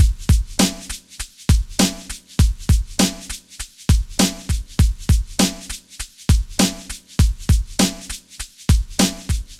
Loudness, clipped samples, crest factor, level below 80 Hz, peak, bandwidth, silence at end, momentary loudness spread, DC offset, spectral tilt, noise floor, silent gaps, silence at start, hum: -20 LUFS; under 0.1%; 18 dB; -22 dBFS; 0 dBFS; 16 kHz; 0.05 s; 15 LU; under 0.1%; -4.5 dB/octave; -36 dBFS; none; 0 s; none